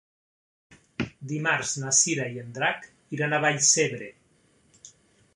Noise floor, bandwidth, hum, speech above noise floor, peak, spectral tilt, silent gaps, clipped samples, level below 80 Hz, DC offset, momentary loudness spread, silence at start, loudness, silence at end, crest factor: -64 dBFS; 11.5 kHz; none; 38 dB; -8 dBFS; -2.5 dB/octave; none; under 0.1%; -64 dBFS; under 0.1%; 18 LU; 0.7 s; -24 LUFS; 0.45 s; 22 dB